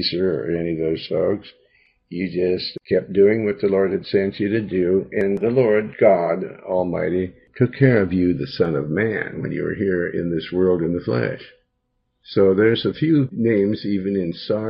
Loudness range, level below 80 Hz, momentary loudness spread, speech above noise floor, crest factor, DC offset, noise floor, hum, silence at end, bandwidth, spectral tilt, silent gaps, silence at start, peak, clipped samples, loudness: 3 LU; -56 dBFS; 9 LU; 52 dB; 18 dB; under 0.1%; -72 dBFS; none; 0 s; 5.6 kHz; -10 dB/octave; none; 0 s; -2 dBFS; under 0.1%; -20 LUFS